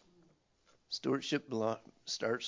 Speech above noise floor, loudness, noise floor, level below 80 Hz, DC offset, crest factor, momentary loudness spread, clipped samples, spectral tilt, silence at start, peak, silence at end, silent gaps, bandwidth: 35 dB; -37 LUFS; -71 dBFS; -80 dBFS; under 0.1%; 18 dB; 8 LU; under 0.1%; -4 dB/octave; 0.9 s; -20 dBFS; 0 s; none; 7.6 kHz